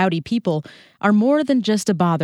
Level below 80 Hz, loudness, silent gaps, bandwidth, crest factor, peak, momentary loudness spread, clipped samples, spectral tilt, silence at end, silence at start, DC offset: -60 dBFS; -19 LUFS; none; 14 kHz; 14 dB; -4 dBFS; 7 LU; under 0.1%; -6 dB/octave; 0 s; 0 s; under 0.1%